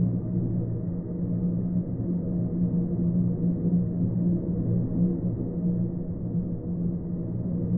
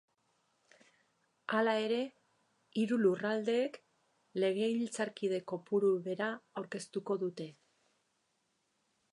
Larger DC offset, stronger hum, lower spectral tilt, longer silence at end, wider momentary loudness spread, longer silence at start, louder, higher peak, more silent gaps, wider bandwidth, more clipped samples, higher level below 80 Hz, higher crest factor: neither; neither; first, -16.5 dB/octave vs -5.5 dB/octave; second, 0 s vs 1.6 s; second, 5 LU vs 12 LU; second, 0 s vs 1.5 s; first, -28 LUFS vs -35 LUFS; first, -14 dBFS vs -18 dBFS; neither; second, 1.4 kHz vs 11 kHz; neither; first, -44 dBFS vs -90 dBFS; second, 12 dB vs 18 dB